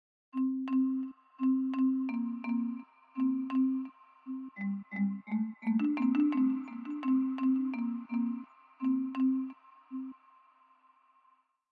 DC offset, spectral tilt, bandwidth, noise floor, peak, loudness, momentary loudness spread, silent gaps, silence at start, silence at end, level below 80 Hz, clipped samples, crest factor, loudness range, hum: under 0.1%; -9 dB/octave; 4.3 kHz; -70 dBFS; -18 dBFS; -33 LUFS; 14 LU; none; 0.35 s; 1.6 s; under -90 dBFS; under 0.1%; 14 dB; 5 LU; none